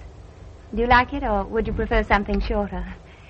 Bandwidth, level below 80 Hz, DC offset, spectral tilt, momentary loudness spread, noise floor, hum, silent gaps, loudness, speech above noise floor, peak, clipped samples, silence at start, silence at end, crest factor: 7 kHz; -30 dBFS; under 0.1%; -7 dB/octave; 14 LU; -42 dBFS; none; none; -22 LUFS; 21 dB; -2 dBFS; under 0.1%; 0 s; 0.05 s; 22 dB